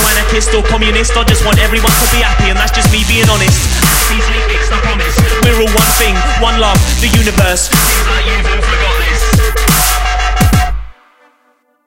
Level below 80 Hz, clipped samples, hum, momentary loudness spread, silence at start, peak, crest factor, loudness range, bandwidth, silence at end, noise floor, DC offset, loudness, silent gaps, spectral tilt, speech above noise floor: -14 dBFS; under 0.1%; none; 4 LU; 0 s; 0 dBFS; 10 dB; 2 LU; 17 kHz; 0.95 s; -55 dBFS; under 0.1%; -10 LUFS; none; -3.5 dB/octave; 45 dB